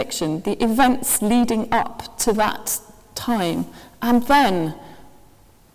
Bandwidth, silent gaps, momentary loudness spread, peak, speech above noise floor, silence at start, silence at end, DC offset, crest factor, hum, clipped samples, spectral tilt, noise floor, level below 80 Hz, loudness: 16 kHz; none; 13 LU; 0 dBFS; 32 dB; 0 s; 0.65 s; under 0.1%; 20 dB; none; under 0.1%; -3.5 dB/octave; -52 dBFS; -46 dBFS; -20 LUFS